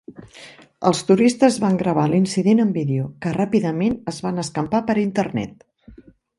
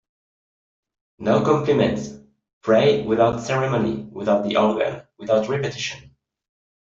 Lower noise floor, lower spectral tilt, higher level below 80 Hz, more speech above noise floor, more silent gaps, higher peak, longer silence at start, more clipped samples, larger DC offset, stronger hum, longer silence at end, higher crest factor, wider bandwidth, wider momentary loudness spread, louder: second, -47 dBFS vs under -90 dBFS; about the same, -6.5 dB/octave vs -6 dB/octave; about the same, -54 dBFS vs -54 dBFS; second, 28 dB vs over 70 dB; second, none vs 2.53-2.61 s; about the same, -2 dBFS vs -4 dBFS; second, 0.1 s vs 1.2 s; neither; neither; neither; second, 0.45 s vs 0.8 s; about the same, 18 dB vs 18 dB; first, 11.5 kHz vs 7.8 kHz; second, 9 LU vs 12 LU; about the same, -20 LUFS vs -21 LUFS